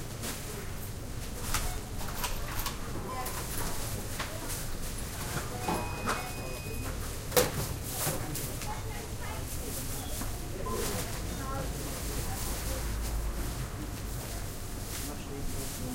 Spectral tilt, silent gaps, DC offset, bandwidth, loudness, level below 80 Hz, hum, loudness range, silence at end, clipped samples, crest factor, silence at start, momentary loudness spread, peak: -3.5 dB/octave; none; under 0.1%; 17 kHz; -36 LUFS; -40 dBFS; none; 4 LU; 0 s; under 0.1%; 26 dB; 0 s; 6 LU; -8 dBFS